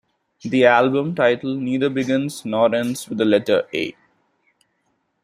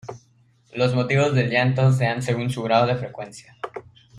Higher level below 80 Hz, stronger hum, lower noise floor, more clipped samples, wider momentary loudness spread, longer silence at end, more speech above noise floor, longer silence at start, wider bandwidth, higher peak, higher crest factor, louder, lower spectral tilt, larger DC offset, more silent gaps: second, -64 dBFS vs -58 dBFS; neither; first, -69 dBFS vs -59 dBFS; neither; second, 11 LU vs 18 LU; first, 1.3 s vs 0 s; first, 51 dB vs 38 dB; first, 0.45 s vs 0.05 s; first, 16 kHz vs 11 kHz; about the same, -2 dBFS vs -4 dBFS; about the same, 20 dB vs 18 dB; about the same, -19 LUFS vs -21 LUFS; about the same, -5.5 dB/octave vs -6.5 dB/octave; neither; neither